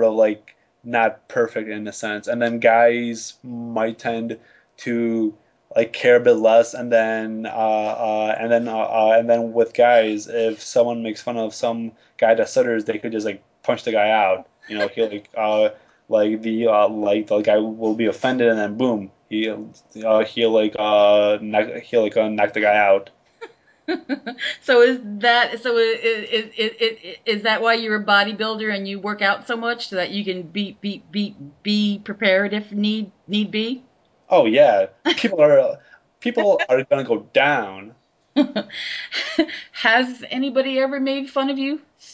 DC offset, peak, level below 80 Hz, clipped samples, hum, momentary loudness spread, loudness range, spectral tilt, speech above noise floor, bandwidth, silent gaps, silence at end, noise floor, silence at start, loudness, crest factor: under 0.1%; -2 dBFS; -68 dBFS; under 0.1%; none; 12 LU; 4 LU; -4.5 dB/octave; 23 dB; 8 kHz; none; 0.35 s; -43 dBFS; 0 s; -20 LUFS; 18 dB